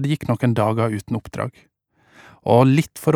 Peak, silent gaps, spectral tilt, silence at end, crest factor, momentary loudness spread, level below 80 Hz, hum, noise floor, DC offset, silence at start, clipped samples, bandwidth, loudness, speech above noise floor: -2 dBFS; none; -7.5 dB/octave; 0 s; 18 dB; 14 LU; -54 dBFS; none; -54 dBFS; under 0.1%; 0 s; under 0.1%; 16.5 kHz; -20 LUFS; 36 dB